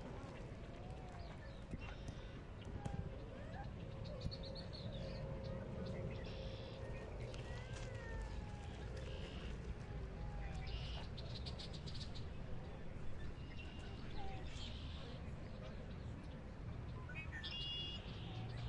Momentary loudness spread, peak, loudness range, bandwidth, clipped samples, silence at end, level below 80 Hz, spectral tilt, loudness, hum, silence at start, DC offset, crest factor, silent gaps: 5 LU; -30 dBFS; 3 LU; 11 kHz; under 0.1%; 0 s; -52 dBFS; -6 dB/octave; -50 LUFS; none; 0 s; under 0.1%; 18 dB; none